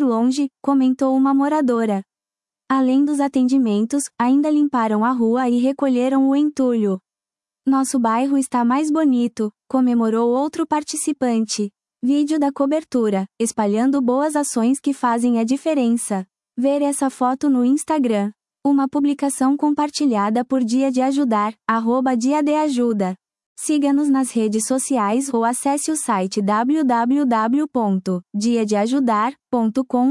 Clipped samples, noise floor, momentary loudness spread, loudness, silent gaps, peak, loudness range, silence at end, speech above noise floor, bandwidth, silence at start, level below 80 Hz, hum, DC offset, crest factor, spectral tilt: under 0.1%; under -90 dBFS; 5 LU; -19 LUFS; 23.46-23.56 s; -4 dBFS; 2 LU; 0 s; over 72 dB; 12 kHz; 0 s; -70 dBFS; none; under 0.1%; 14 dB; -5 dB/octave